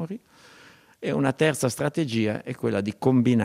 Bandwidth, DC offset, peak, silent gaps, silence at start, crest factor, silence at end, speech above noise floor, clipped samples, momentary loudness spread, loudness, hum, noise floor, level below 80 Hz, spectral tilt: 15.5 kHz; under 0.1%; -8 dBFS; none; 0 s; 18 dB; 0 s; 29 dB; under 0.1%; 10 LU; -25 LUFS; none; -53 dBFS; -66 dBFS; -6 dB/octave